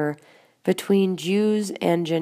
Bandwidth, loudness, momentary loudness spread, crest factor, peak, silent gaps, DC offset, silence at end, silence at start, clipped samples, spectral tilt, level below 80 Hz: 15.5 kHz; -23 LUFS; 8 LU; 16 dB; -8 dBFS; none; under 0.1%; 0 s; 0 s; under 0.1%; -6 dB/octave; -76 dBFS